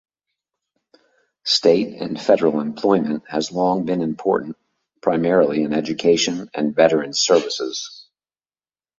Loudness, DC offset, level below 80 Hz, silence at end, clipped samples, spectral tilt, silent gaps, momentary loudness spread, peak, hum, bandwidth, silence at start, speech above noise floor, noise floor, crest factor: -19 LUFS; under 0.1%; -62 dBFS; 1 s; under 0.1%; -4 dB/octave; none; 8 LU; -2 dBFS; none; 8 kHz; 1.45 s; over 71 dB; under -90 dBFS; 18 dB